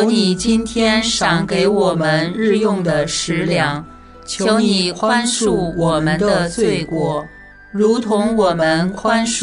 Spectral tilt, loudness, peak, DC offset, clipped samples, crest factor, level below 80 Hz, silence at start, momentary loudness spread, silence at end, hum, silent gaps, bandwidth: -4.5 dB/octave; -16 LUFS; -2 dBFS; under 0.1%; under 0.1%; 14 dB; -42 dBFS; 0 s; 5 LU; 0 s; none; none; 11 kHz